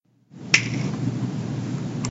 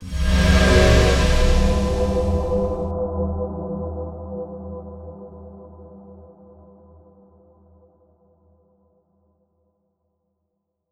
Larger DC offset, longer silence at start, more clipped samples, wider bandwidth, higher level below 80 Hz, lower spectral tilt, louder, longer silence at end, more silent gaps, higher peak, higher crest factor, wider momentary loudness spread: neither; first, 0.3 s vs 0 s; neither; second, 8.2 kHz vs 13.5 kHz; second, -58 dBFS vs -26 dBFS; second, -4 dB/octave vs -5.5 dB/octave; second, -24 LUFS vs -20 LUFS; second, 0 s vs 4.65 s; neither; about the same, 0 dBFS vs -2 dBFS; first, 26 dB vs 20 dB; second, 9 LU vs 25 LU